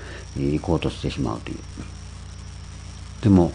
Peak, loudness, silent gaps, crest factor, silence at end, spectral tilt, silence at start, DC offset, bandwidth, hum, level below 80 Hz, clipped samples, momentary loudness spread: -4 dBFS; -24 LUFS; none; 20 dB; 0 s; -7.5 dB/octave; 0 s; under 0.1%; 10 kHz; 60 Hz at -40 dBFS; -38 dBFS; under 0.1%; 18 LU